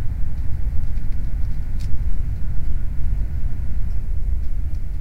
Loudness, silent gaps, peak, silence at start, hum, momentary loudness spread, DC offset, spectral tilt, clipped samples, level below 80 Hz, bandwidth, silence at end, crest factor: -28 LUFS; none; -4 dBFS; 0 s; none; 2 LU; 7%; -8 dB/octave; under 0.1%; -22 dBFS; 2.4 kHz; 0 s; 12 dB